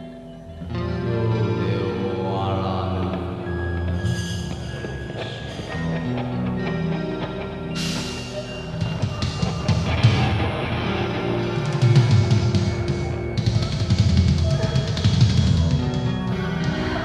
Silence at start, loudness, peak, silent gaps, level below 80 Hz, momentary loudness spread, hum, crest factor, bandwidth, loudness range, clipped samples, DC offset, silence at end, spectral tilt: 0 s; -23 LUFS; -4 dBFS; none; -36 dBFS; 12 LU; none; 18 dB; 11.5 kHz; 7 LU; under 0.1%; under 0.1%; 0 s; -6.5 dB/octave